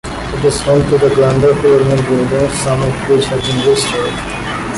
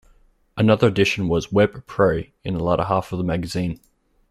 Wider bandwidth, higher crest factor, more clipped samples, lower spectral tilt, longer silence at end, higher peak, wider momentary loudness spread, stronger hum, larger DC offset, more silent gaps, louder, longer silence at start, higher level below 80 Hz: second, 11.5 kHz vs 13.5 kHz; second, 12 dB vs 18 dB; neither; about the same, -5.5 dB/octave vs -6.5 dB/octave; second, 0 s vs 0.55 s; about the same, -2 dBFS vs -4 dBFS; second, 8 LU vs 11 LU; neither; neither; neither; first, -13 LUFS vs -21 LUFS; second, 0.05 s vs 0.55 s; first, -32 dBFS vs -46 dBFS